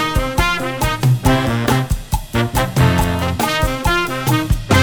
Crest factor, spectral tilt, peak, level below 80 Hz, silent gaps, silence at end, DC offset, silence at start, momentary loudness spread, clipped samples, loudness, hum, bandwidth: 16 dB; -5 dB/octave; 0 dBFS; -24 dBFS; none; 0 s; under 0.1%; 0 s; 4 LU; under 0.1%; -17 LUFS; none; over 20 kHz